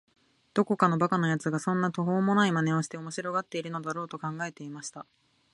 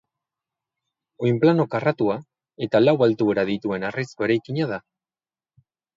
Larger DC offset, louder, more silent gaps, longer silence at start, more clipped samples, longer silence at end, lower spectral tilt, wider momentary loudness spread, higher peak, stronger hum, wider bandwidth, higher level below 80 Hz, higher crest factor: neither; second, -29 LUFS vs -22 LUFS; neither; second, 0.55 s vs 1.2 s; neither; second, 0.5 s vs 1.15 s; second, -6 dB/octave vs -8 dB/octave; first, 13 LU vs 10 LU; about the same, -6 dBFS vs -4 dBFS; neither; first, 11.5 kHz vs 7.6 kHz; second, -72 dBFS vs -64 dBFS; about the same, 22 dB vs 18 dB